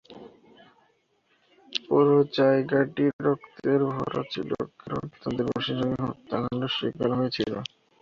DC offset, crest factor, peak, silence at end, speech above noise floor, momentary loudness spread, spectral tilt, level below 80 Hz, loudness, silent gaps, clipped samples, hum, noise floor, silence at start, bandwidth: under 0.1%; 18 dB; -8 dBFS; 0.35 s; 43 dB; 12 LU; -7 dB/octave; -60 dBFS; -26 LUFS; 3.13-3.19 s; under 0.1%; none; -68 dBFS; 0.1 s; 7 kHz